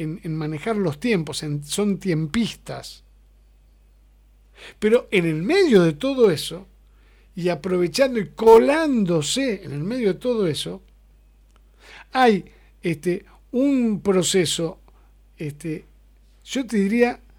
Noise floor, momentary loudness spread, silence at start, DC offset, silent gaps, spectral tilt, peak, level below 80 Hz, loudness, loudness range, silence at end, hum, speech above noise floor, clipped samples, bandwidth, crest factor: -53 dBFS; 15 LU; 0 s; under 0.1%; none; -5 dB/octave; 0 dBFS; -50 dBFS; -21 LUFS; 7 LU; 0.2 s; 50 Hz at -50 dBFS; 33 dB; under 0.1%; 18 kHz; 22 dB